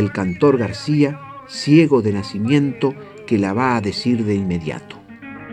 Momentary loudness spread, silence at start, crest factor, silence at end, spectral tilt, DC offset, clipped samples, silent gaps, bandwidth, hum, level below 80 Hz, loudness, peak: 19 LU; 0 s; 18 dB; 0 s; -7 dB/octave; under 0.1%; under 0.1%; none; 10 kHz; none; -52 dBFS; -18 LUFS; -2 dBFS